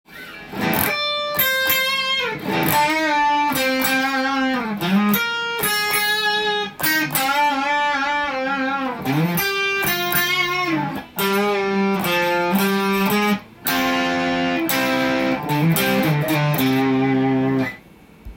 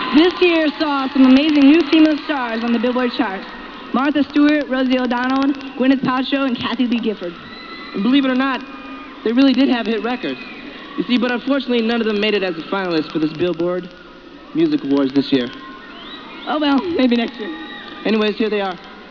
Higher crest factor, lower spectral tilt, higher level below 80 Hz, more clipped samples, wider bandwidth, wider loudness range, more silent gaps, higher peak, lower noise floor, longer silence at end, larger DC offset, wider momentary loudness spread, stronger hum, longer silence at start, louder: about the same, 18 dB vs 14 dB; second, -4 dB/octave vs -6.5 dB/octave; about the same, -52 dBFS vs -52 dBFS; neither; first, 17 kHz vs 5.4 kHz; second, 1 LU vs 5 LU; neither; about the same, 0 dBFS vs -2 dBFS; first, -46 dBFS vs -39 dBFS; about the same, 0 s vs 0 s; neither; second, 5 LU vs 17 LU; neither; about the same, 0.1 s vs 0 s; about the same, -19 LUFS vs -17 LUFS